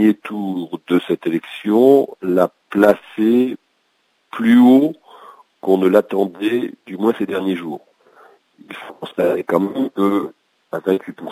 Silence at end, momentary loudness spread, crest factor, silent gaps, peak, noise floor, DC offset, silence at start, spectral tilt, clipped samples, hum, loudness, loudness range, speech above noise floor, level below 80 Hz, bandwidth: 0 s; 18 LU; 18 dB; none; 0 dBFS; -64 dBFS; under 0.1%; 0 s; -7 dB/octave; under 0.1%; none; -17 LUFS; 6 LU; 48 dB; -64 dBFS; 16 kHz